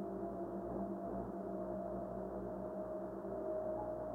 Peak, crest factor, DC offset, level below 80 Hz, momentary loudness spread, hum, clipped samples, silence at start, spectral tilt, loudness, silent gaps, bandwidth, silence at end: -30 dBFS; 12 dB; under 0.1%; -60 dBFS; 3 LU; none; under 0.1%; 0 s; -10 dB/octave; -44 LUFS; none; 16 kHz; 0 s